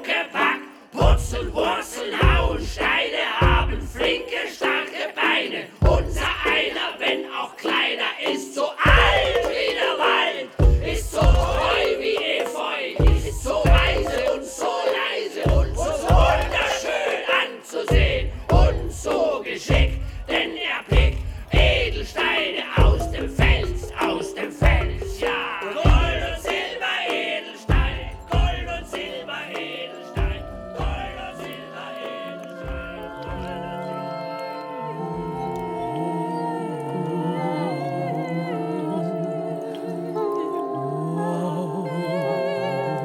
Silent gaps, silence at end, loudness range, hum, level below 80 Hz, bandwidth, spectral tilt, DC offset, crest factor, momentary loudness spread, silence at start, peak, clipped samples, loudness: none; 0 s; 10 LU; none; -26 dBFS; 14.5 kHz; -5 dB/octave; under 0.1%; 20 dB; 12 LU; 0 s; -2 dBFS; under 0.1%; -23 LUFS